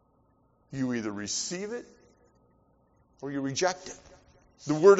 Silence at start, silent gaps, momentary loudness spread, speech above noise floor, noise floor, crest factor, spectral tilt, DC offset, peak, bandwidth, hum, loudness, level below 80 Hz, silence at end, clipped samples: 0.7 s; none; 15 LU; 40 dB; -66 dBFS; 24 dB; -4.5 dB/octave; under 0.1%; -6 dBFS; 8 kHz; none; -31 LUFS; -66 dBFS; 0 s; under 0.1%